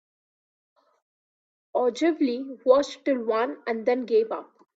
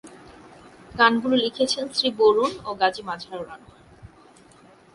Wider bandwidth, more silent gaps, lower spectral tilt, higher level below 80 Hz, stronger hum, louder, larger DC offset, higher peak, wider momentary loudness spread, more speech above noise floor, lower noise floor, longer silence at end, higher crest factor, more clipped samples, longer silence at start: second, 8 kHz vs 11.5 kHz; neither; about the same, -4.5 dB/octave vs -3.5 dB/octave; second, -72 dBFS vs -58 dBFS; neither; second, -25 LUFS vs -22 LUFS; neither; about the same, -6 dBFS vs -4 dBFS; second, 7 LU vs 17 LU; first, over 66 dB vs 30 dB; first, under -90 dBFS vs -52 dBFS; second, 0.35 s vs 0.9 s; about the same, 20 dB vs 20 dB; neither; first, 1.75 s vs 0.05 s